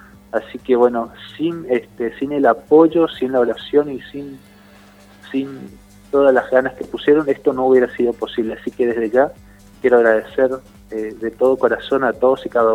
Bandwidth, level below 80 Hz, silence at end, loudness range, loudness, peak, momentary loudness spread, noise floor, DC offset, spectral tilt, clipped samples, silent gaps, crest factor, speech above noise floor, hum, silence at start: 12.5 kHz; -52 dBFS; 0 s; 3 LU; -17 LUFS; 0 dBFS; 13 LU; -45 dBFS; under 0.1%; -6.5 dB/octave; under 0.1%; none; 18 dB; 29 dB; 50 Hz at -50 dBFS; 0.35 s